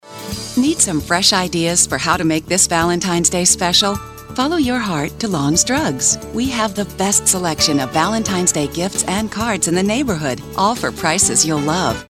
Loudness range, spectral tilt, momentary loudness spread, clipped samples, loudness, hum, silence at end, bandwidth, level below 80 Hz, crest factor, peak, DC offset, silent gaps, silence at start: 3 LU; -3 dB/octave; 8 LU; under 0.1%; -16 LUFS; none; 0.05 s; 16.5 kHz; -40 dBFS; 16 dB; 0 dBFS; under 0.1%; none; 0.05 s